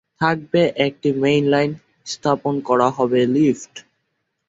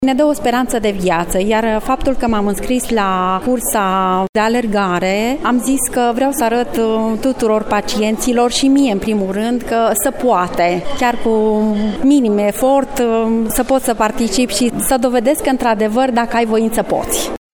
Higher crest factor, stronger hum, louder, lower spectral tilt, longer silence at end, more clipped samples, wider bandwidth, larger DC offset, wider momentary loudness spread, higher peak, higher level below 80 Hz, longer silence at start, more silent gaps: about the same, 16 dB vs 14 dB; neither; second, -19 LUFS vs -15 LUFS; first, -6 dB/octave vs -4 dB/octave; first, 0.7 s vs 0.2 s; neither; second, 8 kHz vs 19.5 kHz; neither; first, 9 LU vs 3 LU; about the same, -2 dBFS vs 0 dBFS; second, -60 dBFS vs -34 dBFS; first, 0.2 s vs 0 s; second, none vs 4.29-4.33 s